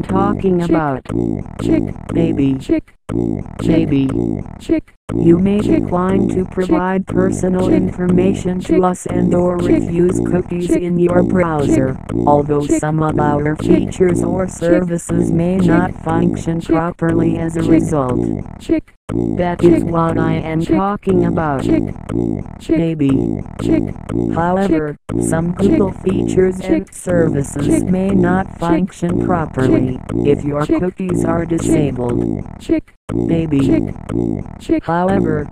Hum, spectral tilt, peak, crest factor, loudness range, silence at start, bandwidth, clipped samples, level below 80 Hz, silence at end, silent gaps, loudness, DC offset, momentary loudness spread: none; -7.5 dB/octave; 0 dBFS; 16 dB; 2 LU; 0 s; 13 kHz; under 0.1%; -34 dBFS; 0 s; 4.97-5.08 s, 18.97-19.08 s, 32.97-33.08 s; -16 LUFS; 0.4%; 6 LU